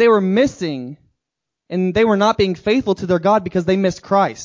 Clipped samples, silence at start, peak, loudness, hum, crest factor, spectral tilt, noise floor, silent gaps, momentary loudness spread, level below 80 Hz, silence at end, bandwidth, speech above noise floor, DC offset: under 0.1%; 0 s; -2 dBFS; -17 LUFS; none; 14 dB; -6.5 dB/octave; -82 dBFS; none; 11 LU; -46 dBFS; 0 s; 7.6 kHz; 66 dB; under 0.1%